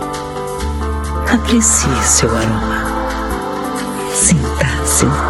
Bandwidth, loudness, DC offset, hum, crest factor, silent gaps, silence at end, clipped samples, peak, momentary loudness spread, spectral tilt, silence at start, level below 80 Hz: 15 kHz; -15 LUFS; under 0.1%; none; 16 dB; none; 0 s; under 0.1%; 0 dBFS; 10 LU; -3.5 dB/octave; 0 s; -24 dBFS